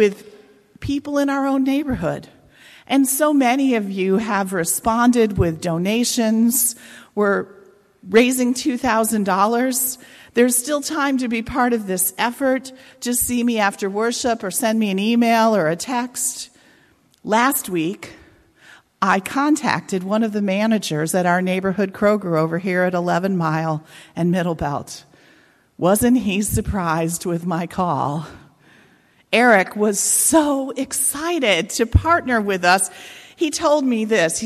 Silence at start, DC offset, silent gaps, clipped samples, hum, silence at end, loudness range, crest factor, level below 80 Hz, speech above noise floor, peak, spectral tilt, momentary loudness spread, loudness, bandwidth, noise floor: 0 s; under 0.1%; none; under 0.1%; none; 0 s; 4 LU; 16 dB; -40 dBFS; 37 dB; -4 dBFS; -4 dB/octave; 9 LU; -19 LUFS; 14.5 kHz; -56 dBFS